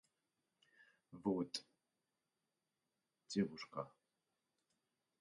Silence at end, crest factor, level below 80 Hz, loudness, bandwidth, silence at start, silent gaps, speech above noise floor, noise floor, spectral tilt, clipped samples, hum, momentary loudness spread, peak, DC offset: 1.3 s; 24 dB; -82 dBFS; -44 LUFS; 10.5 kHz; 1.1 s; none; over 48 dB; under -90 dBFS; -5.5 dB/octave; under 0.1%; none; 10 LU; -26 dBFS; under 0.1%